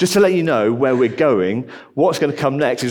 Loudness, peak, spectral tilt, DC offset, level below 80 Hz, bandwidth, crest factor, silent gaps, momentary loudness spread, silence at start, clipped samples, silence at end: -17 LUFS; -2 dBFS; -5.5 dB/octave; under 0.1%; -62 dBFS; 19 kHz; 14 dB; none; 6 LU; 0 s; under 0.1%; 0 s